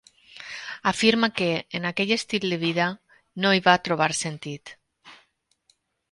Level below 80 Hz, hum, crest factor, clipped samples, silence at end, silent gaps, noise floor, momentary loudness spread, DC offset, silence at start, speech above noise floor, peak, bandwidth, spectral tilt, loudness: -64 dBFS; none; 22 dB; under 0.1%; 0.95 s; none; -67 dBFS; 17 LU; under 0.1%; 0.35 s; 44 dB; -4 dBFS; 11.5 kHz; -4 dB/octave; -23 LUFS